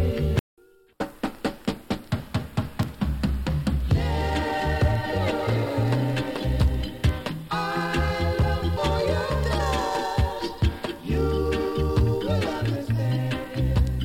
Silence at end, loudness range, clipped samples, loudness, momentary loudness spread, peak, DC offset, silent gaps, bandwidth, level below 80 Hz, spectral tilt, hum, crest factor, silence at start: 0 s; 3 LU; under 0.1%; -26 LUFS; 6 LU; -8 dBFS; under 0.1%; 0.40-0.57 s; 16.5 kHz; -30 dBFS; -6.5 dB/octave; none; 16 dB; 0 s